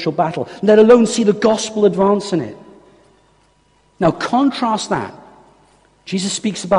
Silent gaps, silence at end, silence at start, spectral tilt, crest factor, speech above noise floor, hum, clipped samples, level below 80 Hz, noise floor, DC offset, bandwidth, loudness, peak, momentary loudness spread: none; 0 s; 0 s; -5 dB/octave; 16 dB; 41 dB; none; under 0.1%; -54 dBFS; -56 dBFS; under 0.1%; 10.5 kHz; -15 LUFS; 0 dBFS; 12 LU